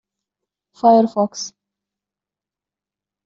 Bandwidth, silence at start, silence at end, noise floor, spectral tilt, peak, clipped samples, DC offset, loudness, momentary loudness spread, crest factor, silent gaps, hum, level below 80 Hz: 7.6 kHz; 0.85 s; 1.8 s; -89 dBFS; -5.5 dB/octave; -2 dBFS; under 0.1%; under 0.1%; -16 LUFS; 17 LU; 20 dB; none; 50 Hz at -50 dBFS; -68 dBFS